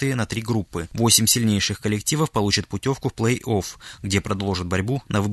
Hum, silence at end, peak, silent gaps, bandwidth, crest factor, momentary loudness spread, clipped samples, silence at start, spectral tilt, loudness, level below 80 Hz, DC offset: none; 0 s; -2 dBFS; none; 12.5 kHz; 20 dB; 9 LU; under 0.1%; 0 s; -4 dB/octave; -22 LUFS; -46 dBFS; under 0.1%